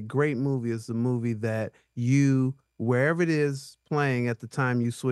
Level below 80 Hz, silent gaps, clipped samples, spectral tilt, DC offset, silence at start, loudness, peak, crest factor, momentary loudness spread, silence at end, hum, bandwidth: -70 dBFS; none; under 0.1%; -7.5 dB/octave; under 0.1%; 0 s; -27 LUFS; -12 dBFS; 14 dB; 8 LU; 0 s; none; 12.5 kHz